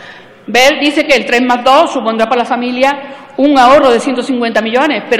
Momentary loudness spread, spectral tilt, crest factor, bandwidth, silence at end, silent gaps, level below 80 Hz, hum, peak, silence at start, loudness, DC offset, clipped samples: 8 LU; -3 dB/octave; 10 dB; 15.5 kHz; 0 s; none; -46 dBFS; none; 0 dBFS; 0 s; -10 LUFS; under 0.1%; 0.2%